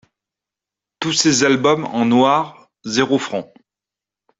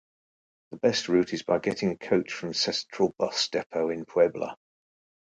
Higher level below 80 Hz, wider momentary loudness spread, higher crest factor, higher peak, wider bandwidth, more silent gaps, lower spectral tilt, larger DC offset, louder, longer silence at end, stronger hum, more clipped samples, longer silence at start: first, -60 dBFS vs -66 dBFS; first, 13 LU vs 5 LU; about the same, 18 dB vs 18 dB; first, 0 dBFS vs -10 dBFS; second, 8 kHz vs 9.4 kHz; second, none vs 3.66-3.70 s; about the same, -3.5 dB/octave vs -4 dB/octave; neither; first, -17 LUFS vs -27 LUFS; first, 0.95 s vs 0.8 s; neither; neither; first, 1 s vs 0.7 s